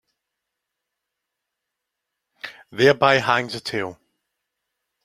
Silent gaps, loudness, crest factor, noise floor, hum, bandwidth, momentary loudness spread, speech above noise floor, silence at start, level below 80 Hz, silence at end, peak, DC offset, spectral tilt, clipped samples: none; -19 LUFS; 24 dB; -82 dBFS; none; 15 kHz; 21 LU; 63 dB; 2.45 s; -64 dBFS; 1.1 s; -2 dBFS; under 0.1%; -4.5 dB/octave; under 0.1%